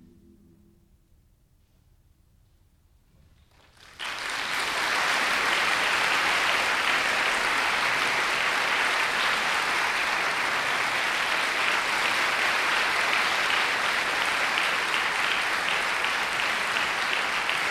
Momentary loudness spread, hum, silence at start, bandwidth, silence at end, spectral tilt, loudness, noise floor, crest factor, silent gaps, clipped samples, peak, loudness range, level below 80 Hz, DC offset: 2 LU; none; 4 s; 16.5 kHz; 0 s; -0.5 dB/octave; -24 LUFS; -62 dBFS; 18 dB; none; under 0.1%; -8 dBFS; 5 LU; -60 dBFS; under 0.1%